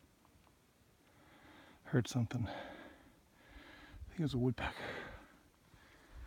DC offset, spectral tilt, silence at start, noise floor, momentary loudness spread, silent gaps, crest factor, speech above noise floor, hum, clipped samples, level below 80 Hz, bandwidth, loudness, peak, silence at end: under 0.1%; -6.5 dB/octave; 1.25 s; -69 dBFS; 26 LU; none; 24 dB; 32 dB; none; under 0.1%; -60 dBFS; 16.5 kHz; -40 LUFS; -20 dBFS; 0 s